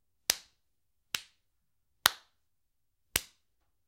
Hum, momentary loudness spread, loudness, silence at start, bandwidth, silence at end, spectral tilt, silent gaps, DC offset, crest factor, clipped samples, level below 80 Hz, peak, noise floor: none; 10 LU; -33 LUFS; 0.3 s; 16 kHz; 0.65 s; 1 dB/octave; none; under 0.1%; 38 dB; under 0.1%; -64 dBFS; 0 dBFS; -83 dBFS